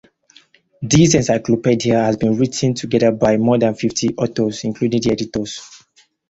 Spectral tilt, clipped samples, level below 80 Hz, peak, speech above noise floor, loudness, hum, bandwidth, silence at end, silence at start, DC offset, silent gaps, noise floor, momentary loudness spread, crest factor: -5.5 dB/octave; under 0.1%; -46 dBFS; -2 dBFS; 39 dB; -17 LUFS; none; 8.2 kHz; 0.55 s; 0.8 s; under 0.1%; none; -55 dBFS; 8 LU; 16 dB